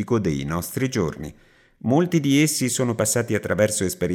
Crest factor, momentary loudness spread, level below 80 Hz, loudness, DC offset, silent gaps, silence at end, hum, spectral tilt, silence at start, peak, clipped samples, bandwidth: 18 dB; 9 LU; -52 dBFS; -22 LUFS; under 0.1%; none; 0 s; none; -5 dB/octave; 0 s; -4 dBFS; under 0.1%; 19 kHz